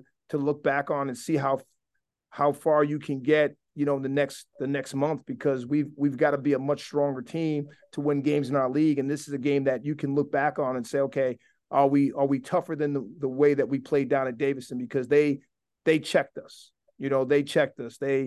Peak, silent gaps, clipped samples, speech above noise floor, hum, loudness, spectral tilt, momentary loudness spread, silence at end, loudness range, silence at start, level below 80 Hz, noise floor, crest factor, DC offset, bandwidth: -8 dBFS; none; under 0.1%; 56 dB; none; -27 LUFS; -6.5 dB/octave; 8 LU; 0 s; 2 LU; 0.3 s; -72 dBFS; -82 dBFS; 18 dB; under 0.1%; 12.5 kHz